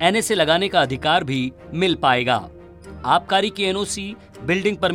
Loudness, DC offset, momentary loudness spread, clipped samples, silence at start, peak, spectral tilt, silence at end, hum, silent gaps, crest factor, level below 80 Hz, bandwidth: -20 LUFS; under 0.1%; 11 LU; under 0.1%; 0 s; -2 dBFS; -4 dB/octave; 0 s; none; none; 18 dB; -50 dBFS; 16.5 kHz